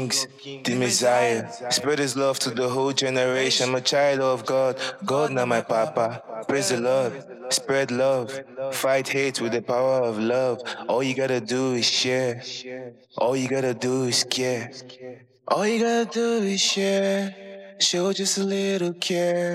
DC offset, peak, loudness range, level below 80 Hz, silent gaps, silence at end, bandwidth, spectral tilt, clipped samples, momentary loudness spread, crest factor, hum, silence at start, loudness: under 0.1%; -6 dBFS; 2 LU; -78 dBFS; none; 0 s; 15.5 kHz; -3.5 dB/octave; under 0.1%; 11 LU; 18 dB; none; 0 s; -23 LUFS